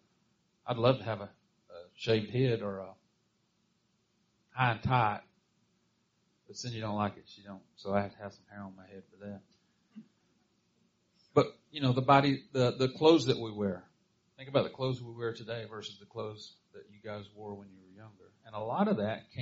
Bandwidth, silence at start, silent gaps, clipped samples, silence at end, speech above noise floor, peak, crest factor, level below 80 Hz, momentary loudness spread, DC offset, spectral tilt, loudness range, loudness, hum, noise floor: 7.6 kHz; 0.65 s; none; under 0.1%; 0 s; 43 dB; -8 dBFS; 26 dB; -68 dBFS; 22 LU; under 0.1%; -5 dB/octave; 13 LU; -32 LUFS; none; -75 dBFS